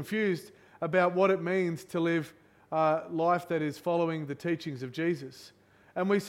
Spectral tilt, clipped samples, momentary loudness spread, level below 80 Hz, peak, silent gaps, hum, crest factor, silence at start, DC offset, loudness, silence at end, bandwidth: -6.5 dB/octave; under 0.1%; 11 LU; -76 dBFS; -12 dBFS; none; none; 18 dB; 0 s; under 0.1%; -30 LUFS; 0 s; 16 kHz